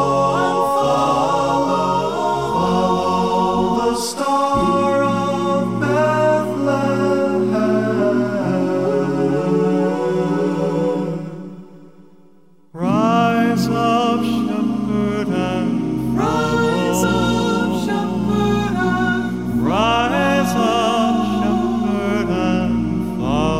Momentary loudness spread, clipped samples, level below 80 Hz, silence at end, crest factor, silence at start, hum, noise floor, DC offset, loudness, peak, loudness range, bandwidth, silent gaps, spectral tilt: 4 LU; under 0.1%; -40 dBFS; 0 s; 14 dB; 0 s; none; -52 dBFS; 0.5%; -18 LUFS; -4 dBFS; 3 LU; 16 kHz; none; -6 dB/octave